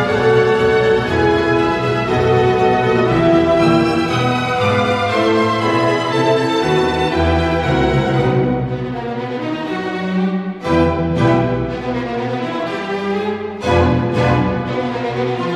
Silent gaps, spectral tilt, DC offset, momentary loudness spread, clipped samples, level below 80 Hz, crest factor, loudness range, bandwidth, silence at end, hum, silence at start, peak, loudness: none; -7 dB/octave; under 0.1%; 8 LU; under 0.1%; -34 dBFS; 14 dB; 4 LU; 12 kHz; 0 s; none; 0 s; -2 dBFS; -16 LUFS